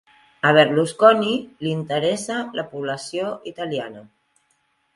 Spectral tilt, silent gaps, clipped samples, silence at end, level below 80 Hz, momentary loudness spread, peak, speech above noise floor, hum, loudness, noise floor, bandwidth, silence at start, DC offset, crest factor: -5 dB/octave; none; under 0.1%; 0.9 s; -66 dBFS; 14 LU; 0 dBFS; 47 dB; none; -21 LUFS; -67 dBFS; 11.5 kHz; 0.45 s; under 0.1%; 22 dB